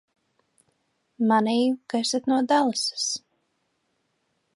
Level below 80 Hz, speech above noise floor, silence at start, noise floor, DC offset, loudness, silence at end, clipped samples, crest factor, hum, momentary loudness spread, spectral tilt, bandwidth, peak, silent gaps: -80 dBFS; 50 dB; 1.2 s; -73 dBFS; under 0.1%; -24 LUFS; 1.35 s; under 0.1%; 18 dB; none; 7 LU; -3 dB/octave; 11.5 kHz; -8 dBFS; none